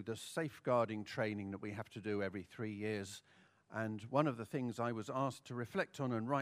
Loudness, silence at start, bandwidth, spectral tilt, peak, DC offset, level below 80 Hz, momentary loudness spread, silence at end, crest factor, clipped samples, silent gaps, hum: -41 LUFS; 0 s; 15.5 kHz; -6 dB/octave; -18 dBFS; under 0.1%; -80 dBFS; 9 LU; 0 s; 24 dB; under 0.1%; none; none